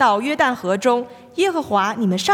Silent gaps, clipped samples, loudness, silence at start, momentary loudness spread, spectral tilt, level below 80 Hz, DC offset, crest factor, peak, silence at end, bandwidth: none; under 0.1%; -19 LUFS; 0 s; 4 LU; -4.5 dB/octave; -66 dBFS; under 0.1%; 16 dB; -4 dBFS; 0 s; 17 kHz